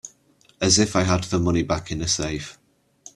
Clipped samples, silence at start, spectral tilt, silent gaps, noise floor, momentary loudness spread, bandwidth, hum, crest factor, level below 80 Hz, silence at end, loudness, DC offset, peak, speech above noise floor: under 0.1%; 0.05 s; -4 dB/octave; none; -59 dBFS; 14 LU; 12.5 kHz; none; 20 dB; -44 dBFS; 0.6 s; -22 LUFS; under 0.1%; -4 dBFS; 37 dB